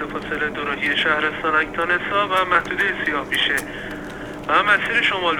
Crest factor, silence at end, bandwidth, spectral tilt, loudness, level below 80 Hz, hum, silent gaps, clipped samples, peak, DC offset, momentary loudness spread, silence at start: 18 dB; 0 s; 20 kHz; -3.5 dB/octave; -19 LUFS; -46 dBFS; 50 Hz at -45 dBFS; none; under 0.1%; -2 dBFS; under 0.1%; 14 LU; 0 s